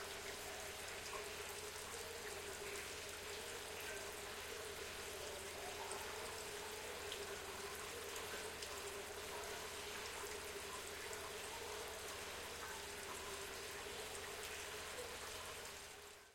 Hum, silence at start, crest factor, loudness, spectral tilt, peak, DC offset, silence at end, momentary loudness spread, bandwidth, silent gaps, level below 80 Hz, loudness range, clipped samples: none; 0 s; 20 dB; -48 LUFS; -1.5 dB/octave; -30 dBFS; under 0.1%; 0 s; 1 LU; 16.5 kHz; none; -68 dBFS; 1 LU; under 0.1%